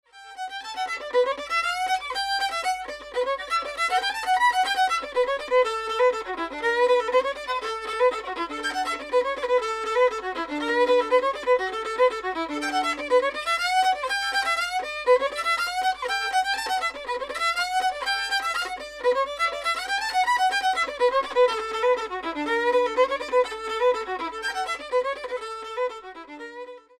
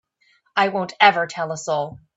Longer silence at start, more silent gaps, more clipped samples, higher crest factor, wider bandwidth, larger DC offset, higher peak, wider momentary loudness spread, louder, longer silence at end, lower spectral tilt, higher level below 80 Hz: second, 0.15 s vs 0.55 s; neither; neither; about the same, 16 dB vs 20 dB; first, 15 kHz vs 8 kHz; neither; second, -8 dBFS vs -2 dBFS; about the same, 9 LU vs 10 LU; second, -24 LUFS vs -20 LUFS; about the same, 0.2 s vs 0.2 s; second, -1 dB/octave vs -3.5 dB/octave; first, -58 dBFS vs -64 dBFS